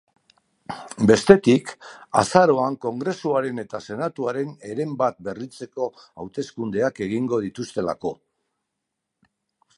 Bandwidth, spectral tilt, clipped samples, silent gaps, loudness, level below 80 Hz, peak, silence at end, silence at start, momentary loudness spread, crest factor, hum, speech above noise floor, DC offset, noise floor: 11.5 kHz; -6 dB/octave; under 0.1%; none; -22 LUFS; -58 dBFS; 0 dBFS; 1.65 s; 0.7 s; 18 LU; 22 dB; none; 59 dB; under 0.1%; -81 dBFS